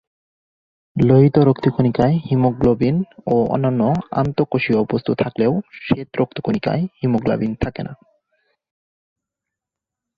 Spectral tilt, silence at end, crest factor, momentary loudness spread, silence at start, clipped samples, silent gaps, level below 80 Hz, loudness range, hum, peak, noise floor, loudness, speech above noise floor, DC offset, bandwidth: -10 dB/octave; 2.25 s; 16 dB; 8 LU; 0.95 s; under 0.1%; none; -46 dBFS; 7 LU; none; -2 dBFS; -86 dBFS; -18 LUFS; 68 dB; under 0.1%; 6.4 kHz